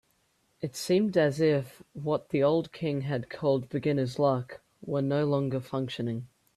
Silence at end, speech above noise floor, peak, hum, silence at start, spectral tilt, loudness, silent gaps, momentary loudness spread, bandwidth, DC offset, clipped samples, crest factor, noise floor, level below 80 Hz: 0.3 s; 43 dB; -12 dBFS; none; 0.6 s; -7 dB/octave; -29 LUFS; none; 12 LU; 14 kHz; under 0.1%; under 0.1%; 16 dB; -71 dBFS; -66 dBFS